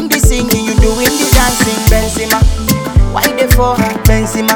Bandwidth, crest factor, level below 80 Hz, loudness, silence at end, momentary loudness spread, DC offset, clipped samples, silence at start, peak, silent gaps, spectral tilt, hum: over 20 kHz; 10 dB; -14 dBFS; -11 LUFS; 0 s; 3 LU; under 0.1%; 0.7%; 0 s; 0 dBFS; none; -4.5 dB/octave; none